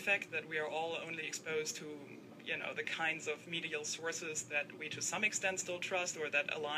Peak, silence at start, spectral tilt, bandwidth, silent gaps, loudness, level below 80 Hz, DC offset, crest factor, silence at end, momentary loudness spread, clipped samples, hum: -20 dBFS; 0 s; -1.5 dB/octave; 15.5 kHz; none; -38 LUFS; -86 dBFS; under 0.1%; 20 dB; 0 s; 8 LU; under 0.1%; none